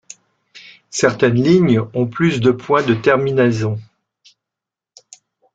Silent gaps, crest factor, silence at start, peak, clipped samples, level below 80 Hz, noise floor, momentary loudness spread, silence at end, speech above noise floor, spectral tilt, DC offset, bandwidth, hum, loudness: none; 16 dB; 0.55 s; -2 dBFS; under 0.1%; -54 dBFS; -85 dBFS; 9 LU; 1.7 s; 71 dB; -6 dB/octave; under 0.1%; 9.2 kHz; none; -16 LUFS